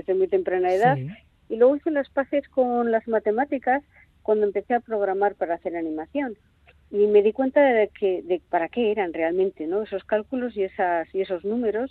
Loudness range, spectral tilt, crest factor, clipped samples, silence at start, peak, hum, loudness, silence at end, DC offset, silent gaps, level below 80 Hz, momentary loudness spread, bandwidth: 3 LU; -8 dB/octave; 16 dB; under 0.1%; 0.1 s; -6 dBFS; none; -24 LUFS; 0 s; under 0.1%; none; -60 dBFS; 9 LU; 7.2 kHz